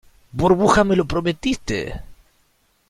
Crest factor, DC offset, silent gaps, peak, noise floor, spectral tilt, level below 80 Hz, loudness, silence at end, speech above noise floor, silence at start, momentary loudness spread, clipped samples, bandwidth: 18 dB; under 0.1%; none; -2 dBFS; -62 dBFS; -5.5 dB/octave; -38 dBFS; -19 LUFS; 0.75 s; 44 dB; 0.35 s; 17 LU; under 0.1%; 14 kHz